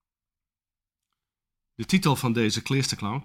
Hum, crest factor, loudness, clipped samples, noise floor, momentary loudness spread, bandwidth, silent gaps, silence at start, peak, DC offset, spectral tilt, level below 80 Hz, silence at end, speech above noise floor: none; 20 dB; -24 LUFS; under 0.1%; under -90 dBFS; 4 LU; 16 kHz; none; 1.8 s; -10 dBFS; under 0.1%; -5 dB/octave; -58 dBFS; 0 s; over 65 dB